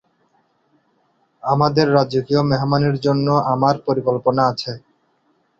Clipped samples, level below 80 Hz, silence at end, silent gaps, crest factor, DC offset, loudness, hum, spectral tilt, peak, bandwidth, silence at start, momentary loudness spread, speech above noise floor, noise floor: under 0.1%; -54 dBFS; 0.8 s; none; 18 dB; under 0.1%; -18 LUFS; none; -7.5 dB/octave; -2 dBFS; 7.4 kHz; 1.45 s; 8 LU; 46 dB; -63 dBFS